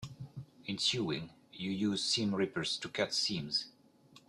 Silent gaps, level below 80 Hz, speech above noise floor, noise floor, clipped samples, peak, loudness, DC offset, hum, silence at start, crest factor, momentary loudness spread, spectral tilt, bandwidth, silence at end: none; -70 dBFS; 27 dB; -62 dBFS; under 0.1%; -18 dBFS; -34 LUFS; under 0.1%; none; 0 s; 18 dB; 16 LU; -3.5 dB/octave; 12.5 kHz; 0.1 s